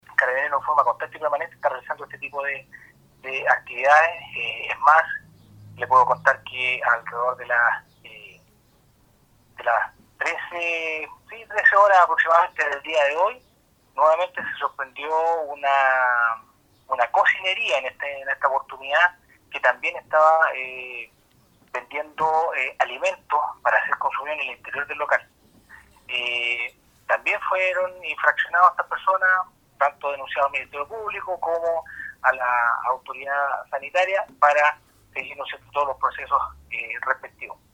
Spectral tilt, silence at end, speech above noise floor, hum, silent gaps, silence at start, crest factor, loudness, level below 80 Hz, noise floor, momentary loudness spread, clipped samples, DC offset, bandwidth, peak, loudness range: -2 dB/octave; 0.2 s; 38 dB; none; none; 0.2 s; 22 dB; -22 LUFS; -64 dBFS; -60 dBFS; 14 LU; under 0.1%; under 0.1%; 16 kHz; -2 dBFS; 6 LU